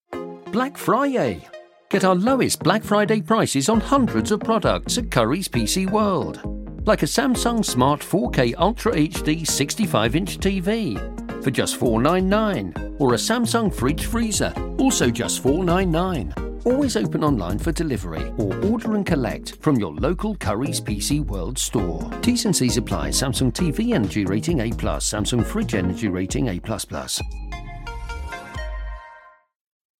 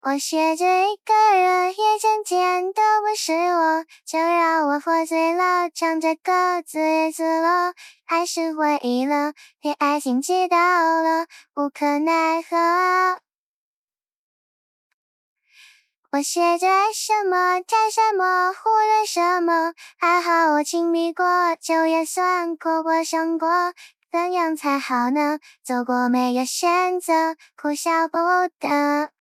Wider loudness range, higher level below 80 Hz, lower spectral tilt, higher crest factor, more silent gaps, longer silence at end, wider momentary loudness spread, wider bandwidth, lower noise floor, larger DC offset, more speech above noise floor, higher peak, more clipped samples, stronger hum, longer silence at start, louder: about the same, 4 LU vs 4 LU; first, -34 dBFS vs under -90 dBFS; first, -5 dB/octave vs -1.5 dB/octave; first, 22 dB vs 14 dB; second, none vs 13.35-13.88 s, 14.16-15.36 s, 15.98-16.03 s; first, 0.7 s vs 0.15 s; first, 9 LU vs 6 LU; about the same, 16.5 kHz vs 15 kHz; second, -47 dBFS vs -55 dBFS; neither; second, 27 dB vs 34 dB; first, 0 dBFS vs -6 dBFS; neither; neither; about the same, 0.1 s vs 0.05 s; about the same, -21 LUFS vs -20 LUFS